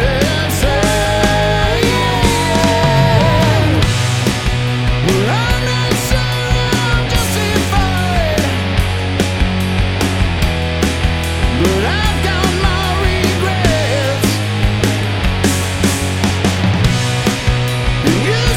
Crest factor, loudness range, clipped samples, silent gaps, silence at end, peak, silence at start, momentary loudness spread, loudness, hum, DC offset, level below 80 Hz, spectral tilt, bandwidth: 14 dB; 3 LU; under 0.1%; none; 0 s; 0 dBFS; 0 s; 4 LU; -14 LUFS; none; under 0.1%; -22 dBFS; -5 dB/octave; 17.5 kHz